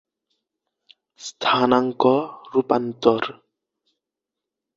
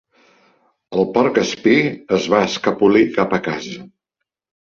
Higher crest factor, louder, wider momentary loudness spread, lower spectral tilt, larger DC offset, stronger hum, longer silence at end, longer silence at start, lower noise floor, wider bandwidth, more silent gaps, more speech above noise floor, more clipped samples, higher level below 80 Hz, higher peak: about the same, 22 dB vs 18 dB; second, -21 LUFS vs -17 LUFS; about the same, 11 LU vs 11 LU; about the same, -5 dB/octave vs -5.5 dB/octave; neither; neither; first, 1.45 s vs 0.85 s; first, 1.2 s vs 0.9 s; first, -86 dBFS vs -80 dBFS; about the same, 7.8 kHz vs 7.6 kHz; neither; about the same, 66 dB vs 64 dB; neither; second, -64 dBFS vs -56 dBFS; about the same, -2 dBFS vs -2 dBFS